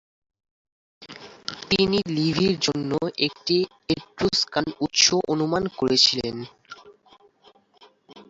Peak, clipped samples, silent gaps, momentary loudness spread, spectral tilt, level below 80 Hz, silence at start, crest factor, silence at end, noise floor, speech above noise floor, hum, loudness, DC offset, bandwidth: -4 dBFS; under 0.1%; none; 17 LU; -3.5 dB/octave; -54 dBFS; 1 s; 22 dB; 0.05 s; -57 dBFS; 34 dB; none; -22 LUFS; under 0.1%; 8 kHz